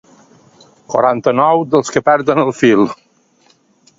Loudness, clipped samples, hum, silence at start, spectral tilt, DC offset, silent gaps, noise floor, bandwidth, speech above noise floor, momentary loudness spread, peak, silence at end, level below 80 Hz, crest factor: -13 LUFS; under 0.1%; none; 0.9 s; -5.5 dB/octave; under 0.1%; none; -54 dBFS; 7.8 kHz; 41 dB; 6 LU; 0 dBFS; 1.05 s; -56 dBFS; 14 dB